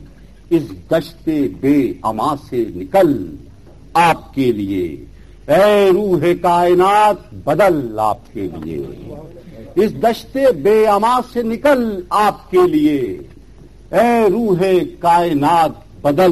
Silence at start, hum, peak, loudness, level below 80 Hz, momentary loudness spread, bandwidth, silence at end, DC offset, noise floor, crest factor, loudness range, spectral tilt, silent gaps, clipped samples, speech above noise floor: 0 s; none; -2 dBFS; -15 LUFS; -42 dBFS; 12 LU; 13 kHz; 0 s; 0.5%; -41 dBFS; 14 dB; 4 LU; -6.5 dB/octave; none; under 0.1%; 26 dB